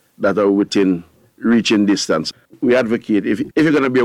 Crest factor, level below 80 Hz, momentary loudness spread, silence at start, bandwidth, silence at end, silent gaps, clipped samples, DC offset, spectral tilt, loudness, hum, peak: 12 dB; -56 dBFS; 7 LU; 0.2 s; 12 kHz; 0 s; none; under 0.1%; under 0.1%; -5 dB/octave; -16 LUFS; none; -4 dBFS